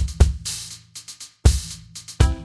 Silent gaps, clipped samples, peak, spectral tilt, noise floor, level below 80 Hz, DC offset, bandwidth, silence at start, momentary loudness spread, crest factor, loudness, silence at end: none; under 0.1%; 0 dBFS; -4.5 dB/octave; -40 dBFS; -24 dBFS; under 0.1%; 11 kHz; 0 s; 17 LU; 22 dB; -22 LUFS; 0 s